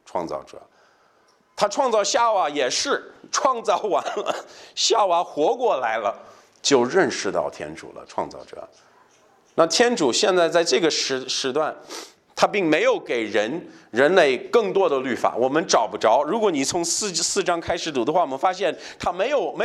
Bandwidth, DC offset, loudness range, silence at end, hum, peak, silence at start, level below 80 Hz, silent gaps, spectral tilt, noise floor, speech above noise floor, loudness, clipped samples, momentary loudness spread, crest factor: 13.5 kHz; under 0.1%; 3 LU; 0 s; none; -2 dBFS; 0.15 s; -60 dBFS; none; -2.5 dB/octave; -60 dBFS; 38 dB; -21 LUFS; under 0.1%; 14 LU; 20 dB